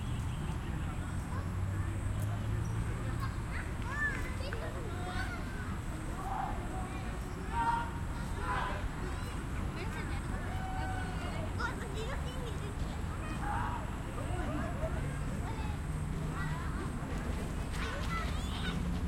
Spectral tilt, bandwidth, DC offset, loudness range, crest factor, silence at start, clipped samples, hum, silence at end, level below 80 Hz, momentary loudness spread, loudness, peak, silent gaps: -6 dB/octave; 16.5 kHz; under 0.1%; 1 LU; 16 dB; 0 s; under 0.1%; none; 0 s; -40 dBFS; 4 LU; -38 LUFS; -20 dBFS; none